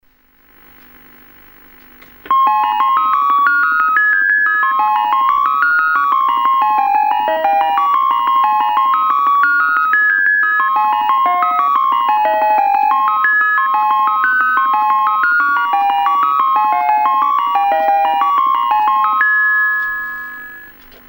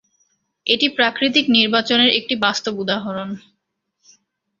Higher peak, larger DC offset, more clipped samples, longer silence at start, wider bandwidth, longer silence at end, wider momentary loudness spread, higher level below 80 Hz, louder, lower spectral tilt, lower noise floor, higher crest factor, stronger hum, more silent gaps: about the same, 0 dBFS vs 0 dBFS; neither; neither; first, 2.25 s vs 0.65 s; first, 16.5 kHz vs 7.6 kHz; second, 0.4 s vs 1.2 s; second, 3 LU vs 13 LU; first, -54 dBFS vs -64 dBFS; first, -13 LUFS vs -17 LUFS; about the same, -3 dB/octave vs -3.5 dB/octave; second, -52 dBFS vs -74 dBFS; second, 14 dB vs 20 dB; neither; neither